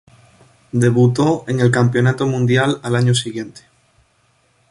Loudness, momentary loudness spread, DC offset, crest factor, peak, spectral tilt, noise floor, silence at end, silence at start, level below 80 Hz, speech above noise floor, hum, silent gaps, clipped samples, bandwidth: -16 LUFS; 10 LU; under 0.1%; 16 dB; -2 dBFS; -6 dB/octave; -59 dBFS; 1.2 s; 0.75 s; -52 dBFS; 44 dB; none; none; under 0.1%; 11.5 kHz